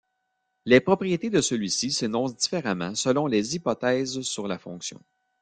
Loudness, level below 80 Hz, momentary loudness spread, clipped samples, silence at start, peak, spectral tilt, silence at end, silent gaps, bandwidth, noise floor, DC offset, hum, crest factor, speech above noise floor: -25 LUFS; -64 dBFS; 12 LU; under 0.1%; 0.65 s; -4 dBFS; -4 dB/octave; 0.45 s; none; 9.8 kHz; -77 dBFS; under 0.1%; none; 22 dB; 52 dB